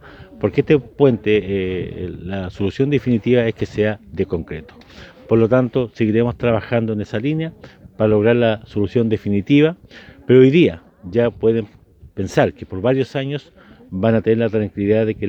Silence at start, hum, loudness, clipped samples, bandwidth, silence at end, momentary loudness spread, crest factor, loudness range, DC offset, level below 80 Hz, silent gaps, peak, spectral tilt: 0.05 s; none; -18 LUFS; under 0.1%; 8.2 kHz; 0 s; 12 LU; 18 dB; 4 LU; under 0.1%; -46 dBFS; none; 0 dBFS; -8 dB/octave